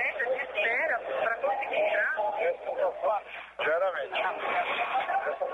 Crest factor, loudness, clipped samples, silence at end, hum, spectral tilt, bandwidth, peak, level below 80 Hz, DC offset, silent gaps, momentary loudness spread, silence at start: 12 dB; -29 LUFS; under 0.1%; 0 s; none; -3.5 dB/octave; 10 kHz; -18 dBFS; -70 dBFS; under 0.1%; none; 4 LU; 0 s